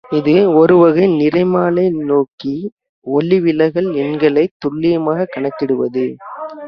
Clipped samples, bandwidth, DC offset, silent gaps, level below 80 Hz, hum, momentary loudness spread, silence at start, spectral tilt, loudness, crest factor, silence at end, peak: under 0.1%; 5.8 kHz; under 0.1%; 2.33-2.38 s, 2.72-2.77 s, 2.89-3.02 s, 4.51-4.60 s; -56 dBFS; none; 13 LU; 0.1 s; -9.5 dB/octave; -14 LUFS; 14 dB; 0 s; 0 dBFS